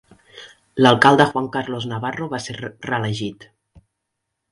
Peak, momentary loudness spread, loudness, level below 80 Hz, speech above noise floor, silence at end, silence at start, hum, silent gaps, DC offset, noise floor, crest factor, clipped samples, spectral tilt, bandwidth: 0 dBFS; 18 LU; -19 LUFS; -56 dBFS; 60 dB; 1.2 s; 0.35 s; none; none; under 0.1%; -78 dBFS; 20 dB; under 0.1%; -5.5 dB/octave; 11.5 kHz